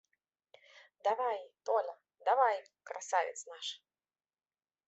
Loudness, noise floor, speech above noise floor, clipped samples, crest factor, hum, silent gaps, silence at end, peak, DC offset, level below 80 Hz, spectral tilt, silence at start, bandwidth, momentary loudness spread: -35 LUFS; under -90 dBFS; over 56 dB; under 0.1%; 20 dB; none; none; 1.1 s; -16 dBFS; under 0.1%; under -90 dBFS; 1 dB/octave; 1.05 s; 8.2 kHz; 15 LU